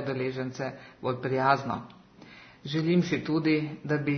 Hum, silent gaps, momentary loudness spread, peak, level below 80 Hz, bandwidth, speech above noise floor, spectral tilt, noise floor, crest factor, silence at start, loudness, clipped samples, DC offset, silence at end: none; none; 15 LU; -10 dBFS; -66 dBFS; 6.6 kHz; 23 dB; -7 dB/octave; -51 dBFS; 20 dB; 0 s; -29 LUFS; under 0.1%; under 0.1%; 0 s